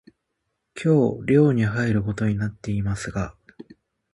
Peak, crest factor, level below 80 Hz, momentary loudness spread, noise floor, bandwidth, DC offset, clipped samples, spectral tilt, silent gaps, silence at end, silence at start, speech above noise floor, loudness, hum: -6 dBFS; 18 dB; -46 dBFS; 11 LU; -77 dBFS; 11.5 kHz; under 0.1%; under 0.1%; -8 dB/octave; none; 0.5 s; 0.75 s; 56 dB; -22 LUFS; none